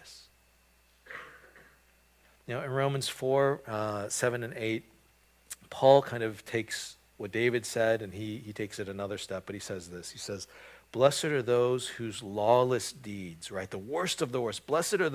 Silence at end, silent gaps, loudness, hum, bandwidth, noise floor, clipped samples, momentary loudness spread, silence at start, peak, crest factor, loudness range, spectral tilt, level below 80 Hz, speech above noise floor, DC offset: 0 s; none; -31 LUFS; none; 16 kHz; -65 dBFS; under 0.1%; 17 LU; 0.05 s; -6 dBFS; 26 dB; 5 LU; -4.5 dB/octave; -64 dBFS; 35 dB; under 0.1%